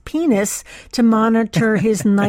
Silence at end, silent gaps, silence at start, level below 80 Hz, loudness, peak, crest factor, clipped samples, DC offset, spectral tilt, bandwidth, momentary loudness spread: 0 s; none; 0.05 s; -48 dBFS; -16 LUFS; -4 dBFS; 12 dB; under 0.1%; under 0.1%; -5.5 dB/octave; 16.5 kHz; 9 LU